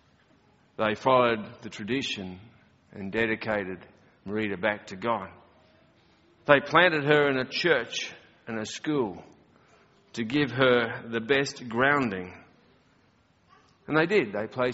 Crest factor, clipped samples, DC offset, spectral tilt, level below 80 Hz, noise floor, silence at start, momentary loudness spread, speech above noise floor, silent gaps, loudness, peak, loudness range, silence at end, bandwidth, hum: 26 dB; under 0.1%; under 0.1%; -3 dB/octave; -64 dBFS; -64 dBFS; 0.8 s; 18 LU; 38 dB; none; -26 LUFS; -2 dBFS; 6 LU; 0 s; 8 kHz; none